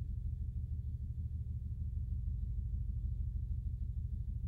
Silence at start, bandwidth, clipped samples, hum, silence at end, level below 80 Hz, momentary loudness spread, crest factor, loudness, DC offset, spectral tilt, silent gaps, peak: 0 s; 0.7 kHz; under 0.1%; none; 0 s; -42 dBFS; 2 LU; 10 dB; -42 LUFS; under 0.1%; -11 dB/octave; none; -28 dBFS